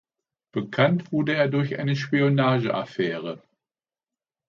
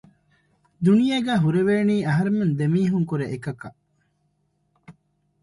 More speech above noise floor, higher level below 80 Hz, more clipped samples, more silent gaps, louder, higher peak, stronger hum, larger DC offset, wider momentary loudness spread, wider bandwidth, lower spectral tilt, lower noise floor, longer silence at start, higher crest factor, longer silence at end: first, over 67 dB vs 48 dB; second, -68 dBFS vs -60 dBFS; neither; neither; second, -24 LUFS vs -21 LUFS; about the same, -6 dBFS vs -8 dBFS; second, none vs 50 Hz at -40 dBFS; neither; about the same, 12 LU vs 12 LU; second, 7 kHz vs 11.5 kHz; about the same, -7.5 dB/octave vs -8 dB/octave; first, under -90 dBFS vs -69 dBFS; second, 0.55 s vs 0.8 s; about the same, 18 dB vs 16 dB; first, 1.1 s vs 0.5 s